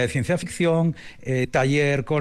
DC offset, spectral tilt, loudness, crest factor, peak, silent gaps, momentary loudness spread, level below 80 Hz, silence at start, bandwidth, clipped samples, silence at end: under 0.1%; -6 dB/octave; -22 LUFS; 12 dB; -10 dBFS; none; 6 LU; -48 dBFS; 0 s; 12.5 kHz; under 0.1%; 0 s